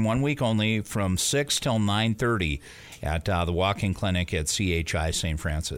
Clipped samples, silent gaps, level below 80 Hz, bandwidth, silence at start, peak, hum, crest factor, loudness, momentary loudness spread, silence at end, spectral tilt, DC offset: under 0.1%; none; -38 dBFS; 16.5 kHz; 0 s; -10 dBFS; none; 14 dB; -26 LUFS; 6 LU; 0 s; -4.5 dB/octave; under 0.1%